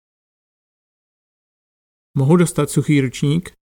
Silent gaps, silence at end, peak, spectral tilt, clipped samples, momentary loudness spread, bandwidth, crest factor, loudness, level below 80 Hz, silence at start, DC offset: none; 0.15 s; -2 dBFS; -6.5 dB/octave; under 0.1%; 6 LU; 17 kHz; 18 dB; -17 LUFS; -52 dBFS; 2.15 s; under 0.1%